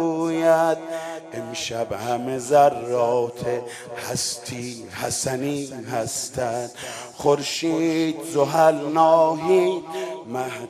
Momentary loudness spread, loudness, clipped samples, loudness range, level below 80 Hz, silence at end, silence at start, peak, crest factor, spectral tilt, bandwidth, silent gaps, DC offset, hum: 14 LU; -22 LUFS; under 0.1%; 7 LU; -62 dBFS; 0 s; 0 s; -4 dBFS; 18 dB; -4.5 dB/octave; 14 kHz; none; under 0.1%; none